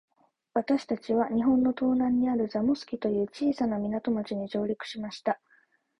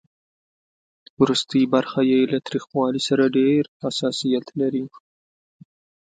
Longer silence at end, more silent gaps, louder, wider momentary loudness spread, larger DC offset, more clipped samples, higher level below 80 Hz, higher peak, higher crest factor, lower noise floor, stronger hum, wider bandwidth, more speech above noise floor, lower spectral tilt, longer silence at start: second, 0.65 s vs 1.25 s; second, none vs 3.68-3.80 s; second, -28 LUFS vs -21 LUFS; about the same, 8 LU vs 7 LU; neither; neither; about the same, -62 dBFS vs -66 dBFS; second, -12 dBFS vs -4 dBFS; about the same, 16 dB vs 20 dB; second, -66 dBFS vs under -90 dBFS; neither; second, 8 kHz vs 9.2 kHz; second, 38 dB vs over 70 dB; first, -7 dB/octave vs -5.5 dB/octave; second, 0.55 s vs 1.2 s